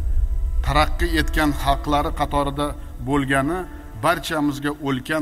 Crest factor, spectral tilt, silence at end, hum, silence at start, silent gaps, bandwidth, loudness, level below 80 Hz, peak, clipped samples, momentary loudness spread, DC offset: 18 dB; -5.5 dB/octave; 0 s; none; 0 s; none; 16 kHz; -22 LUFS; -26 dBFS; -4 dBFS; under 0.1%; 6 LU; under 0.1%